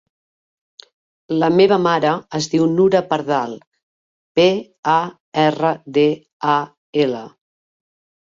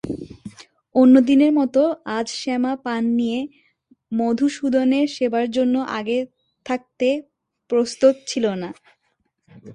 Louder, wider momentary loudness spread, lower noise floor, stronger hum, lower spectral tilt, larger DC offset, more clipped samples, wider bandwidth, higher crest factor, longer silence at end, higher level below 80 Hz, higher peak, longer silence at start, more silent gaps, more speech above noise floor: about the same, -18 LUFS vs -20 LUFS; second, 10 LU vs 16 LU; first, under -90 dBFS vs -70 dBFS; neither; about the same, -5.5 dB/octave vs -5 dB/octave; neither; neither; second, 7.6 kHz vs 9.8 kHz; about the same, 16 dB vs 18 dB; first, 1 s vs 0 s; about the same, -62 dBFS vs -60 dBFS; about the same, -2 dBFS vs -2 dBFS; first, 1.3 s vs 0.05 s; first, 3.67-3.72 s, 3.83-4.35 s, 4.79-4.83 s, 5.20-5.32 s, 6.33-6.40 s, 6.78-6.93 s vs none; first, over 73 dB vs 51 dB